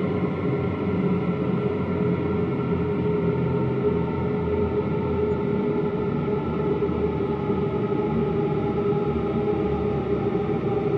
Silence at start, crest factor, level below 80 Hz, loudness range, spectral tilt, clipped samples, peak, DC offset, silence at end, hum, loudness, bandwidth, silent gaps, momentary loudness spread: 0 s; 12 dB; -44 dBFS; 0 LU; -10.5 dB/octave; under 0.1%; -12 dBFS; under 0.1%; 0 s; none; -24 LUFS; 5.6 kHz; none; 2 LU